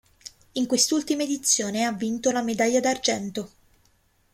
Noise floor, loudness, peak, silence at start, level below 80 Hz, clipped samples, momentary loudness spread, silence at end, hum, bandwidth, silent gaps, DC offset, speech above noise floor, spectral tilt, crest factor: -64 dBFS; -24 LUFS; -6 dBFS; 0.25 s; -62 dBFS; under 0.1%; 13 LU; 0.85 s; none; 16.5 kHz; none; under 0.1%; 40 dB; -2.5 dB/octave; 20 dB